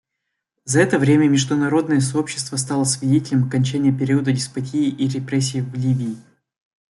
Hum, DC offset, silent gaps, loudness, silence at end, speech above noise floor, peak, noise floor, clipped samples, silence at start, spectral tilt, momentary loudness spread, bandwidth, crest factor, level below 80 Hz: none; under 0.1%; none; -19 LUFS; 0.7 s; 60 dB; -4 dBFS; -79 dBFS; under 0.1%; 0.65 s; -5.5 dB/octave; 8 LU; 12 kHz; 16 dB; -60 dBFS